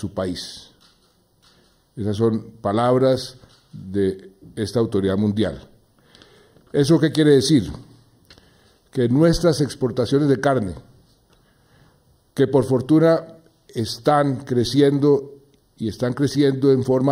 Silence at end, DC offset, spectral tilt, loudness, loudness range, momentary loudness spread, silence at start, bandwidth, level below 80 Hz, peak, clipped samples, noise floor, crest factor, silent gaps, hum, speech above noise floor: 0 s; under 0.1%; -6.5 dB/octave; -20 LUFS; 4 LU; 17 LU; 0 s; 16 kHz; -48 dBFS; -4 dBFS; under 0.1%; -60 dBFS; 16 dB; none; none; 41 dB